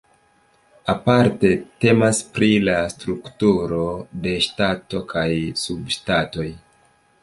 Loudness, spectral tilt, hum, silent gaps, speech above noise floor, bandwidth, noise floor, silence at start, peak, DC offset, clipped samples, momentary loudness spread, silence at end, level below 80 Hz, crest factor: -20 LUFS; -5 dB/octave; none; none; 39 dB; 11.5 kHz; -59 dBFS; 0.85 s; -2 dBFS; under 0.1%; under 0.1%; 11 LU; 0.65 s; -46 dBFS; 20 dB